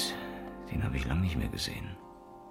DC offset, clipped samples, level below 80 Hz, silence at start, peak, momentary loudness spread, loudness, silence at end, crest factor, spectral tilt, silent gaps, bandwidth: under 0.1%; under 0.1%; -42 dBFS; 0 s; -20 dBFS; 17 LU; -35 LUFS; 0 s; 16 dB; -5 dB/octave; none; 16.5 kHz